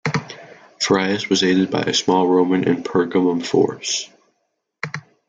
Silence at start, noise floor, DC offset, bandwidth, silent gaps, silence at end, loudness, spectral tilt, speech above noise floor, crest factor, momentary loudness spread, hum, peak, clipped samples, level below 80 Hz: 0.05 s; -72 dBFS; under 0.1%; 9.4 kHz; none; 0.3 s; -18 LUFS; -4.5 dB/octave; 55 dB; 18 dB; 13 LU; none; -2 dBFS; under 0.1%; -62 dBFS